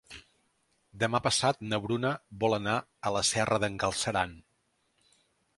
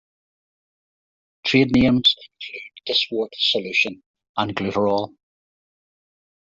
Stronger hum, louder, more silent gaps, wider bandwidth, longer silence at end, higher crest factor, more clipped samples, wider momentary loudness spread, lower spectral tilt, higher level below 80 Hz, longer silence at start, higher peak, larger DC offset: neither; second, -30 LUFS vs -20 LUFS; second, none vs 4.06-4.14 s, 4.29-4.34 s; first, 11.5 kHz vs 7.6 kHz; second, 1.2 s vs 1.45 s; about the same, 20 dB vs 20 dB; neither; second, 6 LU vs 17 LU; second, -3.5 dB/octave vs -5 dB/octave; second, -58 dBFS vs -50 dBFS; second, 0.1 s vs 1.45 s; second, -10 dBFS vs -4 dBFS; neither